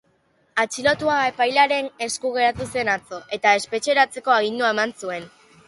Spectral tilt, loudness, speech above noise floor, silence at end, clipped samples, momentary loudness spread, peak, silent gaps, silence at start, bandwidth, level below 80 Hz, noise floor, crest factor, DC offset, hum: -2.5 dB/octave; -21 LUFS; 42 dB; 0.4 s; under 0.1%; 9 LU; -4 dBFS; none; 0.55 s; 11.5 kHz; -58 dBFS; -63 dBFS; 18 dB; under 0.1%; none